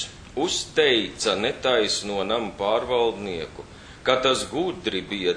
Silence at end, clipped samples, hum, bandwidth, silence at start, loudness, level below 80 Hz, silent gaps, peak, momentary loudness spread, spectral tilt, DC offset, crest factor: 0 s; under 0.1%; none; 10 kHz; 0 s; -24 LUFS; -50 dBFS; none; -4 dBFS; 11 LU; -3 dB/octave; under 0.1%; 20 dB